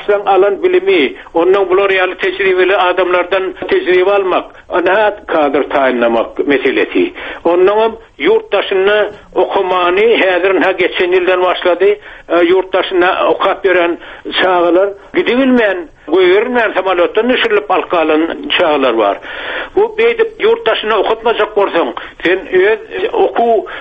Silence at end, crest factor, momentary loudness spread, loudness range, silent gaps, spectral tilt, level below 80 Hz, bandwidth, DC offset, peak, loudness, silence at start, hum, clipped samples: 0 s; 12 dB; 6 LU; 2 LU; none; -6 dB/octave; -46 dBFS; 5.2 kHz; under 0.1%; 0 dBFS; -12 LUFS; 0 s; none; under 0.1%